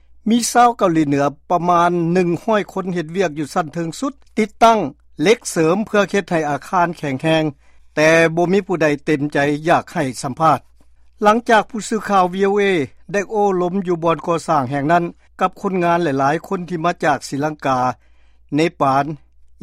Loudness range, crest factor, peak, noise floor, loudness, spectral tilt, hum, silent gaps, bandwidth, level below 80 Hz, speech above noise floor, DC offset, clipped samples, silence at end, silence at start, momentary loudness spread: 2 LU; 16 dB; 0 dBFS; -47 dBFS; -18 LUFS; -5.5 dB/octave; none; none; 15.5 kHz; -52 dBFS; 30 dB; under 0.1%; under 0.1%; 0.45 s; 0.25 s; 9 LU